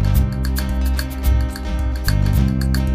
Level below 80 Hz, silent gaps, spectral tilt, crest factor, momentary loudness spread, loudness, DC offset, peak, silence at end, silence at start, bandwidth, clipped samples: -20 dBFS; none; -6 dB/octave; 14 dB; 5 LU; -20 LUFS; under 0.1%; -4 dBFS; 0 s; 0 s; 15.5 kHz; under 0.1%